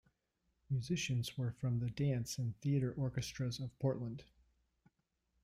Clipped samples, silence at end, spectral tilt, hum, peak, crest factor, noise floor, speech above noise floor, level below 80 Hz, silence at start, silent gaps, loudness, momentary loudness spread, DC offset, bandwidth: under 0.1%; 1.2 s; -6 dB/octave; none; -22 dBFS; 16 dB; -83 dBFS; 45 dB; -66 dBFS; 0.7 s; none; -39 LUFS; 5 LU; under 0.1%; 15 kHz